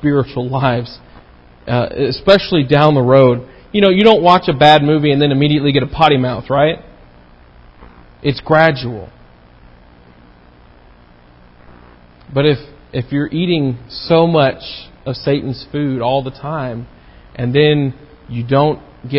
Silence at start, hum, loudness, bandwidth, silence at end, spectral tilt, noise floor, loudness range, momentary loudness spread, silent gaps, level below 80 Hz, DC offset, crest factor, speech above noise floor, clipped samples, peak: 0 s; 60 Hz at -45 dBFS; -14 LUFS; 8 kHz; 0 s; -8 dB/octave; -44 dBFS; 10 LU; 16 LU; none; -42 dBFS; under 0.1%; 14 dB; 31 dB; 0.1%; 0 dBFS